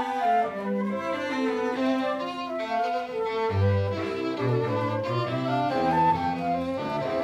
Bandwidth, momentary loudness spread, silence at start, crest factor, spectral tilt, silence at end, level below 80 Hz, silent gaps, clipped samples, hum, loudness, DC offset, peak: 12 kHz; 5 LU; 0 s; 14 dB; -7.5 dB/octave; 0 s; -60 dBFS; none; under 0.1%; none; -27 LUFS; under 0.1%; -12 dBFS